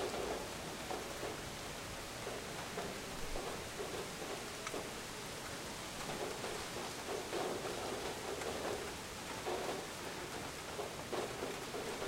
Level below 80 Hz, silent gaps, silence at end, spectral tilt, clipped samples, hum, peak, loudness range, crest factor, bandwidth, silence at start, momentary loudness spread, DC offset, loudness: -58 dBFS; none; 0 s; -3 dB/octave; under 0.1%; none; -26 dBFS; 2 LU; 16 dB; 16 kHz; 0 s; 4 LU; under 0.1%; -43 LUFS